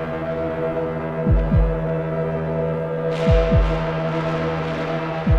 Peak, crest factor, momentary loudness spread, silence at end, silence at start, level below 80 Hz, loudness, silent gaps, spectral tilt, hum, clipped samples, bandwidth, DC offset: -6 dBFS; 14 dB; 6 LU; 0 s; 0 s; -26 dBFS; -22 LUFS; none; -8.5 dB/octave; none; under 0.1%; 7.6 kHz; under 0.1%